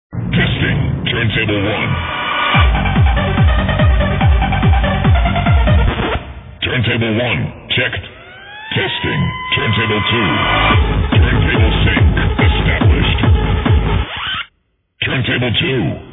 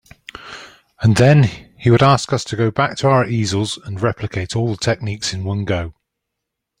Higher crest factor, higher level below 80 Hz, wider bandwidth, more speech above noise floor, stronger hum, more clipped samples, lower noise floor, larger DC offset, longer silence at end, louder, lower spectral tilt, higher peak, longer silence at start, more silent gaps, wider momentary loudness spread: about the same, 12 dB vs 16 dB; first, -20 dBFS vs -46 dBFS; second, 4 kHz vs 11 kHz; second, 48 dB vs 63 dB; neither; neither; second, -62 dBFS vs -79 dBFS; neither; second, 0 s vs 0.9 s; first, -14 LUFS vs -17 LUFS; first, -9.5 dB/octave vs -6 dB/octave; about the same, 0 dBFS vs -2 dBFS; second, 0.1 s vs 0.4 s; neither; second, 7 LU vs 20 LU